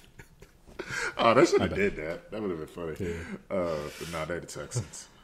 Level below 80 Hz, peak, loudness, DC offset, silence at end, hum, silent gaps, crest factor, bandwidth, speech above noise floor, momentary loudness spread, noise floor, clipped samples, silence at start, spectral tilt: -52 dBFS; -6 dBFS; -30 LUFS; under 0.1%; 0.2 s; none; none; 24 dB; 15 kHz; 25 dB; 15 LU; -54 dBFS; under 0.1%; 0.2 s; -5 dB/octave